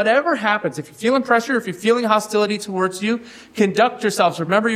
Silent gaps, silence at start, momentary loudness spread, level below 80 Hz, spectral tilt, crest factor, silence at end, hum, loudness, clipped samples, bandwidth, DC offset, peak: none; 0 s; 7 LU; -66 dBFS; -4.5 dB/octave; 16 dB; 0 s; none; -19 LUFS; under 0.1%; 16 kHz; under 0.1%; -2 dBFS